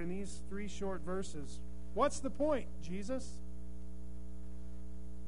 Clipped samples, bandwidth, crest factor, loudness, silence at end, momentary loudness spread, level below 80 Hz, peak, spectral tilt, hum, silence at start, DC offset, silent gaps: under 0.1%; 10.5 kHz; 22 dB; -41 LUFS; 0 s; 16 LU; -50 dBFS; -18 dBFS; -5.5 dB/octave; none; 0 s; 1%; none